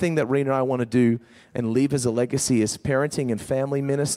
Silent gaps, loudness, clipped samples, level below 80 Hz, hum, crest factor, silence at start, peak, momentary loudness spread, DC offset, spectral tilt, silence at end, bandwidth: none; -23 LUFS; under 0.1%; -56 dBFS; none; 14 dB; 0 s; -8 dBFS; 5 LU; under 0.1%; -5.5 dB/octave; 0 s; 15.5 kHz